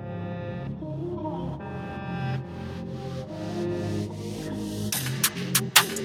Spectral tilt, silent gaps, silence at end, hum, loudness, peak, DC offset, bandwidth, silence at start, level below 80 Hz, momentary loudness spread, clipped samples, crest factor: -3.5 dB/octave; none; 0 s; none; -29 LUFS; 0 dBFS; under 0.1%; over 20 kHz; 0 s; -52 dBFS; 13 LU; under 0.1%; 28 dB